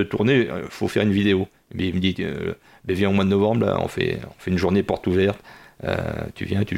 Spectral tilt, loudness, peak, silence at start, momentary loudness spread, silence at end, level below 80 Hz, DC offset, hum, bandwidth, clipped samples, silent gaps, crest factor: -7 dB/octave; -22 LUFS; -6 dBFS; 0 s; 11 LU; 0 s; -48 dBFS; under 0.1%; none; 15.5 kHz; under 0.1%; none; 16 dB